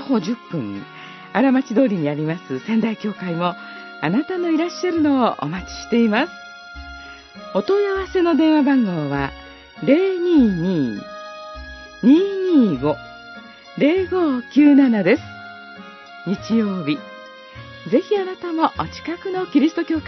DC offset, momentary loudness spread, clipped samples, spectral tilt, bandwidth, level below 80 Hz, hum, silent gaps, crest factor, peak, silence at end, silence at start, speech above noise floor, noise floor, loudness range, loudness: under 0.1%; 21 LU; under 0.1%; -7 dB/octave; 6.2 kHz; -48 dBFS; none; none; 18 dB; -2 dBFS; 0 s; 0 s; 22 dB; -40 dBFS; 5 LU; -19 LUFS